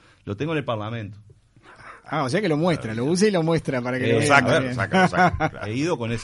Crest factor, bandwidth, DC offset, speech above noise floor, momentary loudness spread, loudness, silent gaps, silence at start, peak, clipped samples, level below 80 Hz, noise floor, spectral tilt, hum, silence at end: 20 dB; 11.5 kHz; under 0.1%; 29 dB; 13 LU; -22 LUFS; none; 0.25 s; -2 dBFS; under 0.1%; -48 dBFS; -50 dBFS; -5.5 dB/octave; none; 0 s